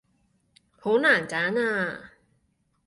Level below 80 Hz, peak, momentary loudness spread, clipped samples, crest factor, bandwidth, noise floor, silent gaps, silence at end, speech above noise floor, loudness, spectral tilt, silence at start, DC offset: -68 dBFS; -8 dBFS; 13 LU; under 0.1%; 18 dB; 11.5 kHz; -71 dBFS; none; 0.8 s; 46 dB; -24 LUFS; -4.5 dB/octave; 0.85 s; under 0.1%